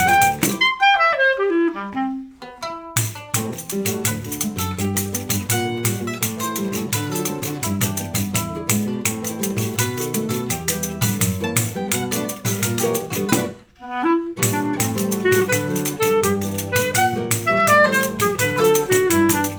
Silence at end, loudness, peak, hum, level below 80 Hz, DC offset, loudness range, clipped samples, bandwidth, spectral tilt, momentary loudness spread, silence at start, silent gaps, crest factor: 0 s; -20 LUFS; -2 dBFS; none; -54 dBFS; under 0.1%; 5 LU; under 0.1%; over 20 kHz; -4 dB/octave; 8 LU; 0 s; none; 18 dB